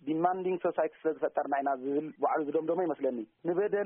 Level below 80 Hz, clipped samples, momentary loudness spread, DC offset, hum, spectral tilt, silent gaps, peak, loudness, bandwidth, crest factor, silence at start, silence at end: -80 dBFS; under 0.1%; 4 LU; under 0.1%; none; -2 dB/octave; none; -14 dBFS; -32 LUFS; 3.6 kHz; 18 dB; 0.05 s; 0 s